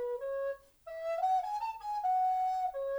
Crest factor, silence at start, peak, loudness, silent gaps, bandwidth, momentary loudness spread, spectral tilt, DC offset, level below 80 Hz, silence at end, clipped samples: 10 dB; 0 s; -24 dBFS; -34 LUFS; none; over 20 kHz; 10 LU; -1.5 dB/octave; under 0.1%; -68 dBFS; 0 s; under 0.1%